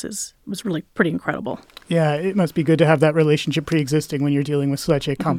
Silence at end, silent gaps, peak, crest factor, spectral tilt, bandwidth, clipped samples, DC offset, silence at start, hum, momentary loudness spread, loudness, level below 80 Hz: 0 s; none; -2 dBFS; 18 dB; -6 dB/octave; 15.5 kHz; under 0.1%; under 0.1%; 0 s; none; 12 LU; -20 LUFS; -52 dBFS